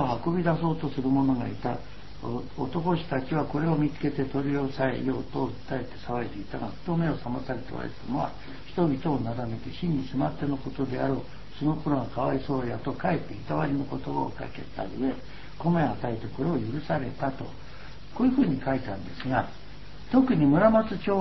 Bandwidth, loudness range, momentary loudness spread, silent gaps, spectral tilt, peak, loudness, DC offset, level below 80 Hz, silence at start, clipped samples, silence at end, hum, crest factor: 6 kHz; 3 LU; 12 LU; none; -9 dB/octave; -8 dBFS; -29 LUFS; 1%; -48 dBFS; 0 s; under 0.1%; 0 s; none; 20 dB